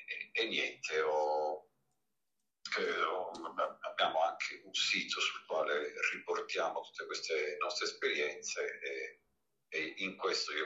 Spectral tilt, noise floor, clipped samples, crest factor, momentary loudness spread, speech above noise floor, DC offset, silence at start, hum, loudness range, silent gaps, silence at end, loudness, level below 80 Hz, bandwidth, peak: -1 dB/octave; -89 dBFS; under 0.1%; 20 dB; 9 LU; 52 dB; under 0.1%; 0 s; none; 3 LU; none; 0 s; -36 LUFS; -86 dBFS; 8.6 kHz; -18 dBFS